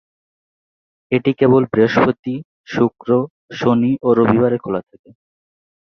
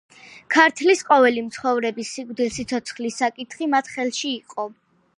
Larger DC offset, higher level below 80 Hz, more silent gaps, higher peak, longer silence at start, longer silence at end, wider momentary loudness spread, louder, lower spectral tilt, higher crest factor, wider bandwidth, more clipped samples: neither; first, -54 dBFS vs -62 dBFS; first, 2.19-2.23 s, 2.45-2.64 s, 3.30-3.48 s vs none; about the same, -2 dBFS vs 0 dBFS; first, 1.1 s vs 0.25 s; first, 1.15 s vs 0.45 s; about the same, 12 LU vs 14 LU; first, -17 LUFS vs -21 LUFS; first, -8 dB/octave vs -2.5 dB/octave; second, 16 dB vs 22 dB; second, 6.6 kHz vs 11.5 kHz; neither